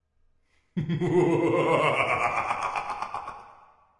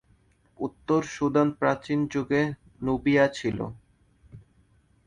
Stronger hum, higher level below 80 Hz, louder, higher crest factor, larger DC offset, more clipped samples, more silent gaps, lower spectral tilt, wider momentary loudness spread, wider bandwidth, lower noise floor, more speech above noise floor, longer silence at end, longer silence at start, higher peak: neither; about the same, -60 dBFS vs -56 dBFS; about the same, -26 LUFS vs -26 LUFS; about the same, 18 dB vs 18 dB; neither; neither; neither; about the same, -6.5 dB/octave vs -6.5 dB/octave; about the same, 14 LU vs 12 LU; about the same, 11.5 kHz vs 10.5 kHz; about the same, -66 dBFS vs -63 dBFS; first, 43 dB vs 38 dB; second, 0.45 s vs 0.7 s; first, 0.75 s vs 0.6 s; about the same, -10 dBFS vs -8 dBFS